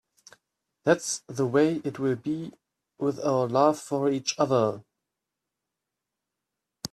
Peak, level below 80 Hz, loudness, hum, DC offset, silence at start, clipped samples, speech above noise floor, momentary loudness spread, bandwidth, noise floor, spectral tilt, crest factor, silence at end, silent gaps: -8 dBFS; -70 dBFS; -26 LUFS; none; under 0.1%; 0.85 s; under 0.1%; 60 dB; 9 LU; 14 kHz; -86 dBFS; -5 dB/octave; 20 dB; 0.05 s; none